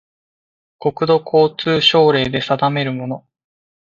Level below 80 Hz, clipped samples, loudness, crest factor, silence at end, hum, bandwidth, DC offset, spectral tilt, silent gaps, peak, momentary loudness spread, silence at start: -54 dBFS; under 0.1%; -16 LUFS; 18 dB; 0.6 s; none; 7.4 kHz; under 0.1%; -6 dB/octave; none; 0 dBFS; 12 LU; 0.8 s